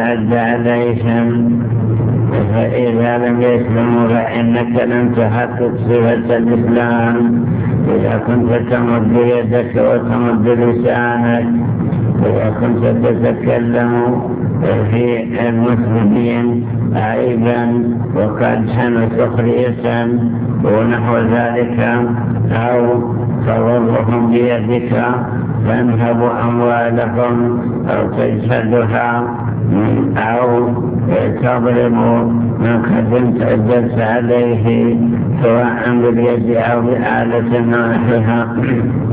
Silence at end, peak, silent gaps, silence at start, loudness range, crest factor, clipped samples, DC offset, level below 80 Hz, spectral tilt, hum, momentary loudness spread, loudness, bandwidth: 0 s; 0 dBFS; none; 0 s; 1 LU; 12 dB; under 0.1%; under 0.1%; -38 dBFS; -12.5 dB/octave; none; 3 LU; -14 LUFS; 4 kHz